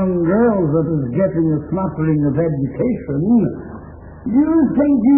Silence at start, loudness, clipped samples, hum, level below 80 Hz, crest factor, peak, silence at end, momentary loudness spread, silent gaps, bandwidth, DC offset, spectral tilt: 0 s; -17 LUFS; under 0.1%; none; -40 dBFS; 12 dB; -4 dBFS; 0 s; 10 LU; none; 2.8 kHz; under 0.1%; -15 dB/octave